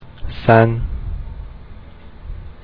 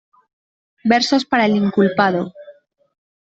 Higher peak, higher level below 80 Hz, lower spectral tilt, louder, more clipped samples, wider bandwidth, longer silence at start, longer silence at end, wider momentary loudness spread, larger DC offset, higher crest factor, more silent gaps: about the same, 0 dBFS vs -2 dBFS; first, -30 dBFS vs -60 dBFS; first, -10.5 dB/octave vs -5.5 dB/octave; about the same, -16 LUFS vs -17 LUFS; neither; second, 5 kHz vs 8 kHz; second, 0 s vs 0.85 s; second, 0 s vs 0.7 s; first, 24 LU vs 9 LU; neither; about the same, 20 dB vs 16 dB; neither